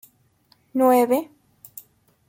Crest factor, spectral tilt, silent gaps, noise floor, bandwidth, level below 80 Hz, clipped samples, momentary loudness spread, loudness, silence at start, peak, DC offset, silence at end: 16 dB; -4.5 dB/octave; none; -61 dBFS; 17 kHz; -72 dBFS; under 0.1%; 25 LU; -20 LUFS; 0.75 s; -6 dBFS; under 0.1%; 1.05 s